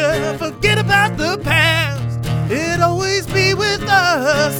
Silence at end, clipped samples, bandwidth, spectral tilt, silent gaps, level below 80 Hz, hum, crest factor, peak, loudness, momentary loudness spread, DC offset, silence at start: 0 s; under 0.1%; 19 kHz; -4.5 dB/octave; none; -36 dBFS; none; 16 dB; 0 dBFS; -15 LUFS; 7 LU; under 0.1%; 0 s